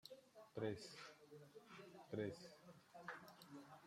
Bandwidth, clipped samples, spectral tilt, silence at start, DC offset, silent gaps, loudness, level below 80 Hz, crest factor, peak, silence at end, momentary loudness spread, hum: 16 kHz; under 0.1%; -5.5 dB/octave; 0.05 s; under 0.1%; none; -55 LUFS; -88 dBFS; 22 dB; -32 dBFS; 0 s; 14 LU; none